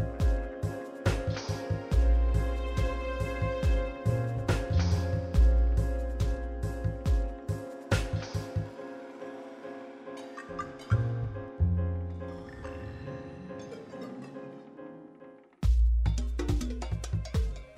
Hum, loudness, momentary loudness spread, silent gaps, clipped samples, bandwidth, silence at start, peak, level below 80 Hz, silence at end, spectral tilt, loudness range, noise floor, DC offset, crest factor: none; -32 LUFS; 16 LU; none; under 0.1%; 11 kHz; 0 s; -14 dBFS; -32 dBFS; 0 s; -7 dB/octave; 8 LU; -53 dBFS; under 0.1%; 16 dB